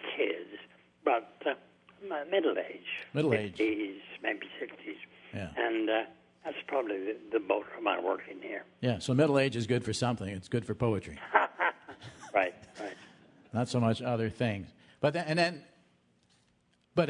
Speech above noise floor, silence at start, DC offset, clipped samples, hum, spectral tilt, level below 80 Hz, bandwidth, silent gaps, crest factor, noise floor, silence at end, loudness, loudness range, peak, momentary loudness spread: 39 dB; 0 s; under 0.1%; under 0.1%; none; -6 dB/octave; -68 dBFS; 11 kHz; none; 26 dB; -71 dBFS; 0 s; -32 LUFS; 4 LU; -8 dBFS; 15 LU